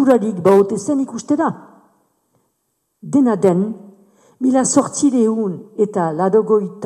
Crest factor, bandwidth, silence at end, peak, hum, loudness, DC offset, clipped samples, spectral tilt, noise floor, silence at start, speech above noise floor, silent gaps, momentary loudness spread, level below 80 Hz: 16 dB; 12 kHz; 0 s; -2 dBFS; none; -16 LUFS; under 0.1%; under 0.1%; -6 dB/octave; -70 dBFS; 0 s; 54 dB; none; 8 LU; -64 dBFS